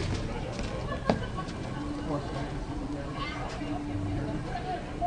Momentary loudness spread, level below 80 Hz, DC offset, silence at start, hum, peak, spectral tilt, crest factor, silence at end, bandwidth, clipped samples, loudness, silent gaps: 5 LU; -42 dBFS; under 0.1%; 0 s; none; -8 dBFS; -6.5 dB/octave; 24 dB; 0 s; 10.5 kHz; under 0.1%; -34 LUFS; none